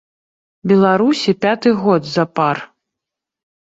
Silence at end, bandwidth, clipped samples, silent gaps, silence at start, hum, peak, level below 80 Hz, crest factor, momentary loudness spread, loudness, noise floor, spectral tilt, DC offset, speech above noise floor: 1.05 s; 7.8 kHz; under 0.1%; none; 0.65 s; none; -2 dBFS; -60 dBFS; 16 dB; 6 LU; -15 LUFS; -83 dBFS; -6.5 dB/octave; under 0.1%; 69 dB